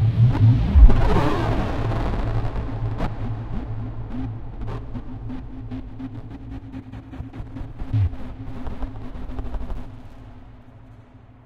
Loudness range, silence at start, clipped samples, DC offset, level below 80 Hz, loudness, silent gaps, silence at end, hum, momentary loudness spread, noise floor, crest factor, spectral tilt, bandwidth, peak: 14 LU; 0 s; under 0.1%; under 0.1%; -24 dBFS; -24 LUFS; none; 0.3 s; none; 20 LU; -46 dBFS; 22 dB; -9 dB/octave; 6.6 kHz; 0 dBFS